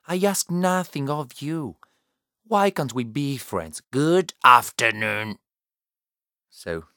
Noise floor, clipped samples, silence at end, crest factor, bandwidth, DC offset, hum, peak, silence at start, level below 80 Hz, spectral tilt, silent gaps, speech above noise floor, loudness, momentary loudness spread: under -90 dBFS; under 0.1%; 0.15 s; 24 dB; 18 kHz; under 0.1%; none; 0 dBFS; 0.1 s; -62 dBFS; -4.5 dB/octave; none; over 68 dB; -22 LUFS; 17 LU